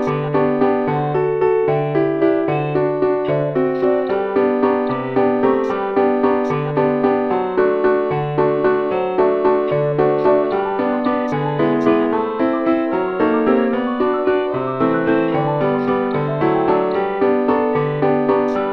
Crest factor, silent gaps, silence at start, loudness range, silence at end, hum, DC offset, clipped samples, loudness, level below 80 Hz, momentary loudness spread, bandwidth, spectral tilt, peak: 14 dB; none; 0 s; 1 LU; 0 s; none; 0.1%; under 0.1%; -17 LUFS; -52 dBFS; 3 LU; 5.8 kHz; -9 dB/octave; -2 dBFS